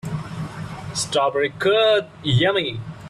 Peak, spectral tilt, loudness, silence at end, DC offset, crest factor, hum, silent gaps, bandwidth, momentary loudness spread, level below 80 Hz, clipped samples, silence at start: -6 dBFS; -4.5 dB/octave; -20 LUFS; 0 s; under 0.1%; 14 dB; none; none; 13 kHz; 14 LU; -50 dBFS; under 0.1%; 0.05 s